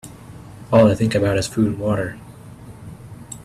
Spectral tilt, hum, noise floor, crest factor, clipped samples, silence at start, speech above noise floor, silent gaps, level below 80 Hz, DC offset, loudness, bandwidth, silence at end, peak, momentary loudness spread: -6.5 dB/octave; none; -39 dBFS; 20 dB; under 0.1%; 0.05 s; 22 dB; none; -46 dBFS; under 0.1%; -18 LUFS; 13.5 kHz; 0 s; -2 dBFS; 25 LU